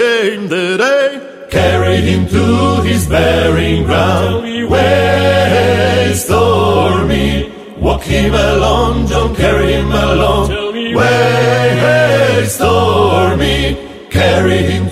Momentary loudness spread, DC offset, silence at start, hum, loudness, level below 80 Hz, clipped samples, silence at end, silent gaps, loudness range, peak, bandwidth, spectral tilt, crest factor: 6 LU; under 0.1%; 0 s; none; -11 LUFS; -24 dBFS; under 0.1%; 0 s; none; 2 LU; 0 dBFS; 15.5 kHz; -5.5 dB/octave; 12 dB